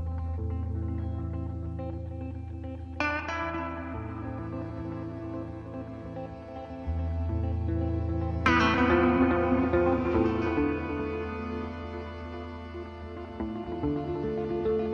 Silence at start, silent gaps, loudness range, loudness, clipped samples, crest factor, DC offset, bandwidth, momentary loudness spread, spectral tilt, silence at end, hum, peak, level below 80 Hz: 0 s; none; 11 LU; -31 LUFS; under 0.1%; 20 dB; under 0.1%; 6.8 kHz; 16 LU; -8 dB/octave; 0 s; none; -10 dBFS; -40 dBFS